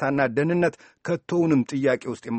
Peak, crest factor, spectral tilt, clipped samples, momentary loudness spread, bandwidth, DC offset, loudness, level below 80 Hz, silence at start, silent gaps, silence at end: -6 dBFS; 16 dB; -7.5 dB/octave; under 0.1%; 8 LU; 8.6 kHz; under 0.1%; -24 LUFS; -62 dBFS; 0 s; none; 0 s